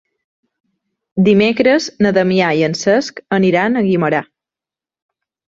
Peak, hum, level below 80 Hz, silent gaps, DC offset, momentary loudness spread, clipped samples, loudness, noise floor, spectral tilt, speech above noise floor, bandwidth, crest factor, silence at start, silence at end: -2 dBFS; none; -56 dBFS; none; under 0.1%; 6 LU; under 0.1%; -14 LUFS; -89 dBFS; -6 dB/octave; 75 dB; 7.8 kHz; 14 dB; 1.15 s; 1.35 s